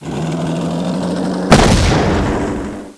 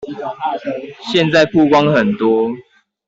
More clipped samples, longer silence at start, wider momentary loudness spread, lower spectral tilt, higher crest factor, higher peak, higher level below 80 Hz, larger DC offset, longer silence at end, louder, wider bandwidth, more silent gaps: first, 0.2% vs under 0.1%; about the same, 0 s vs 0 s; second, 10 LU vs 14 LU; about the same, -5.5 dB/octave vs -6 dB/octave; about the same, 14 dB vs 14 dB; about the same, 0 dBFS vs -2 dBFS; first, -24 dBFS vs -54 dBFS; neither; second, 0.05 s vs 0.45 s; about the same, -15 LUFS vs -15 LUFS; first, 11 kHz vs 7.8 kHz; neither